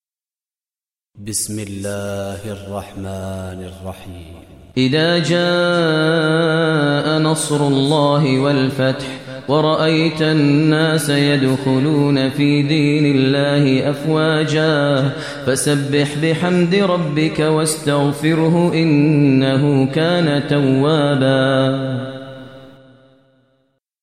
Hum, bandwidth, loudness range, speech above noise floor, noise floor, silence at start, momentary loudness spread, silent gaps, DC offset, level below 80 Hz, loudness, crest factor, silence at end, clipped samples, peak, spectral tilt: none; 14 kHz; 8 LU; over 74 dB; under -90 dBFS; 1.15 s; 13 LU; none; 0.2%; -54 dBFS; -16 LUFS; 14 dB; 1.35 s; under 0.1%; -2 dBFS; -5.5 dB/octave